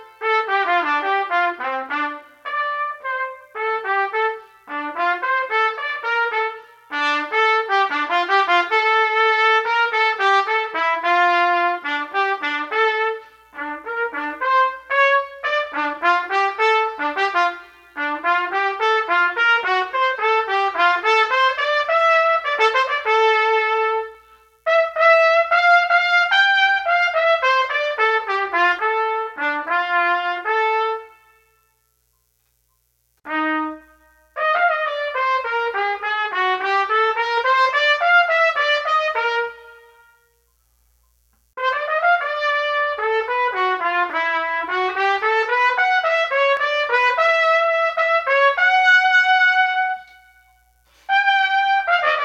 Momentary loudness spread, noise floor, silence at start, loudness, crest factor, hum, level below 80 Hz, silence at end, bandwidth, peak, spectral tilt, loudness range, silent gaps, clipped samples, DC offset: 10 LU; -66 dBFS; 0 s; -18 LUFS; 16 dB; 60 Hz at -80 dBFS; -66 dBFS; 0 s; 9 kHz; -2 dBFS; -1 dB/octave; 7 LU; none; under 0.1%; under 0.1%